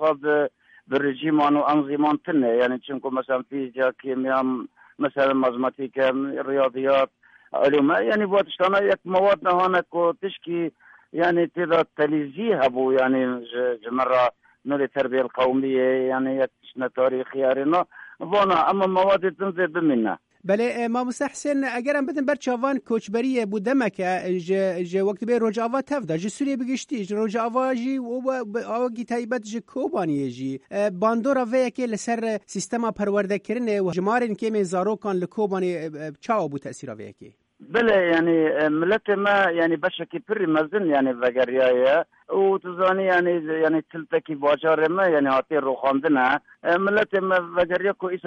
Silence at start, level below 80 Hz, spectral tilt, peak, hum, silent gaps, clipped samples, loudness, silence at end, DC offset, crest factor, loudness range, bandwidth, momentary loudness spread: 0 s; -66 dBFS; -5.5 dB/octave; -8 dBFS; none; none; under 0.1%; -23 LUFS; 0 s; under 0.1%; 14 dB; 4 LU; 11 kHz; 8 LU